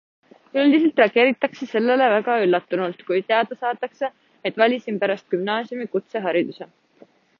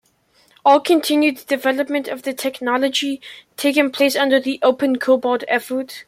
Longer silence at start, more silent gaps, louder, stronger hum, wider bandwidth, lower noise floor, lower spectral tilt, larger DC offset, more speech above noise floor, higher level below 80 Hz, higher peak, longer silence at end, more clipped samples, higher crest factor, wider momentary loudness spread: about the same, 0.55 s vs 0.65 s; neither; second, -21 LUFS vs -18 LUFS; neither; second, 6.8 kHz vs 16.5 kHz; second, -53 dBFS vs -58 dBFS; first, -6.5 dB/octave vs -2.5 dB/octave; neither; second, 33 dB vs 40 dB; about the same, -74 dBFS vs -70 dBFS; about the same, -4 dBFS vs -2 dBFS; first, 0.75 s vs 0.05 s; neither; about the same, 18 dB vs 16 dB; about the same, 11 LU vs 9 LU